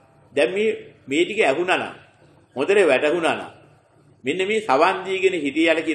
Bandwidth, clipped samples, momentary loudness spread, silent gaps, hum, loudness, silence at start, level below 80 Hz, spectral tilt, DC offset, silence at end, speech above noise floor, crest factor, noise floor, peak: 10.5 kHz; under 0.1%; 12 LU; none; 50 Hz at -65 dBFS; -20 LUFS; 0.35 s; -70 dBFS; -4 dB/octave; under 0.1%; 0 s; 35 dB; 18 dB; -55 dBFS; -4 dBFS